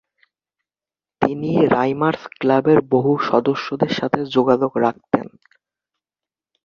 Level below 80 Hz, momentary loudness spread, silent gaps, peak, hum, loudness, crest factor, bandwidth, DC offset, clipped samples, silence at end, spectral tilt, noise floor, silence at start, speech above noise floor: -58 dBFS; 7 LU; none; 0 dBFS; none; -18 LUFS; 20 dB; 7 kHz; under 0.1%; under 0.1%; 1.4 s; -7.5 dB/octave; under -90 dBFS; 1.2 s; over 72 dB